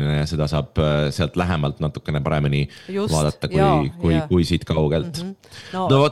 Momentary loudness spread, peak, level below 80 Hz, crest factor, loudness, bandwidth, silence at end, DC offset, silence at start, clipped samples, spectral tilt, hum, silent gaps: 8 LU; -2 dBFS; -36 dBFS; 18 dB; -21 LUFS; 12.5 kHz; 0 s; 0.2%; 0 s; under 0.1%; -6.5 dB/octave; none; none